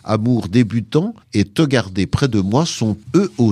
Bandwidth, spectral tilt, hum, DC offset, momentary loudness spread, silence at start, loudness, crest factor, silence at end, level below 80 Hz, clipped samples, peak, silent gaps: 14 kHz; -6.5 dB/octave; none; under 0.1%; 4 LU; 0.05 s; -18 LUFS; 16 dB; 0 s; -42 dBFS; under 0.1%; -2 dBFS; none